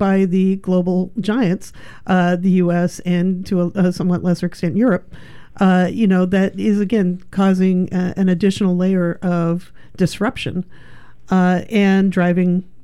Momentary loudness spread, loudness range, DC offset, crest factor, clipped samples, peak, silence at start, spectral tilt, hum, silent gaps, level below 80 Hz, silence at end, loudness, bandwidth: 6 LU; 2 LU; 1%; 12 dB; under 0.1%; -4 dBFS; 0 s; -7.5 dB/octave; none; none; -48 dBFS; 0.2 s; -17 LUFS; 11.5 kHz